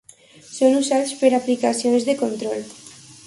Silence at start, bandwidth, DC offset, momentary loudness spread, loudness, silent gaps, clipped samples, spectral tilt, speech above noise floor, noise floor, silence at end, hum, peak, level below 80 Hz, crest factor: 0.5 s; 11.5 kHz; under 0.1%; 19 LU; -20 LUFS; none; under 0.1%; -3.5 dB/octave; 28 dB; -47 dBFS; 0.15 s; none; -4 dBFS; -68 dBFS; 18 dB